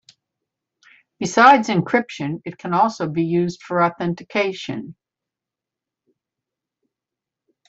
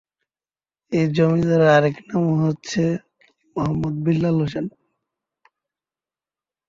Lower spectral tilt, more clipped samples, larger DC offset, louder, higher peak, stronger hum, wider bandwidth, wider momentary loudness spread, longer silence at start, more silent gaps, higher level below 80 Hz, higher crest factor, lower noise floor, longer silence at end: second, -5.5 dB/octave vs -7.5 dB/octave; neither; neither; about the same, -19 LUFS vs -20 LUFS; about the same, -2 dBFS vs -2 dBFS; neither; about the same, 8 kHz vs 7.6 kHz; first, 17 LU vs 11 LU; first, 1.2 s vs 0.9 s; neither; second, -64 dBFS vs -52 dBFS; about the same, 20 dB vs 18 dB; about the same, -87 dBFS vs under -90 dBFS; first, 2.75 s vs 2 s